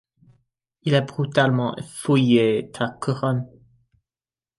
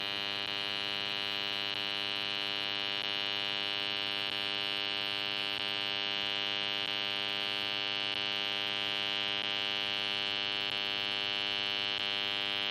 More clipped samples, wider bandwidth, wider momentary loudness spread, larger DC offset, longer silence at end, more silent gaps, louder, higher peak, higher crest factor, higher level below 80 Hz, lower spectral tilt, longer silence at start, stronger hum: neither; second, 11.5 kHz vs 16.5 kHz; first, 11 LU vs 1 LU; neither; first, 1.15 s vs 0 s; neither; first, -22 LUFS vs -32 LUFS; first, -6 dBFS vs -18 dBFS; about the same, 18 dB vs 18 dB; first, -62 dBFS vs -72 dBFS; first, -6.5 dB/octave vs -2 dB/octave; first, 0.85 s vs 0 s; neither